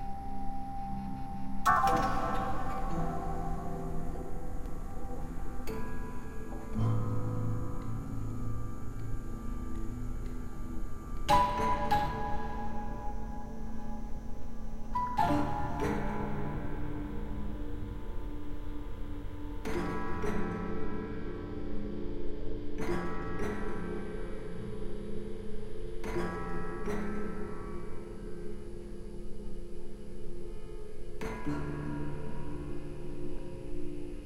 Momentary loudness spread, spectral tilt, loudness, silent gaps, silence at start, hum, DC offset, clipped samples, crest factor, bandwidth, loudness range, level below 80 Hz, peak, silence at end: 13 LU; -6.5 dB/octave; -37 LUFS; none; 0 s; none; under 0.1%; under 0.1%; 20 dB; 12.5 kHz; 8 LU; -40 dBFS; -12 dBFS; 0 s